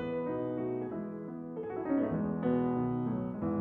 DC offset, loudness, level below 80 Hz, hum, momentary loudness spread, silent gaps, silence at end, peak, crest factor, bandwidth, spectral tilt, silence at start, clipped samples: under 0.1%; -34 LUFS; -60 dBFS; none; 9 LU; none; 0 s; -20 dBFS; 14 dB; 3.8 kHz; -11.5 dB/octave; 0 s; under 0.1%